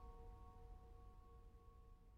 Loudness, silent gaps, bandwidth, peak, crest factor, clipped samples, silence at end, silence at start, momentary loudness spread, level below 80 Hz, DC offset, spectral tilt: -65 LUFS; none; 9 kHz; -48 dBFS; 12 dB; under 0.1%; 0 s; 0 s; 6 LU; -62 dBFS; under 0.1%; -7.5 dB/octave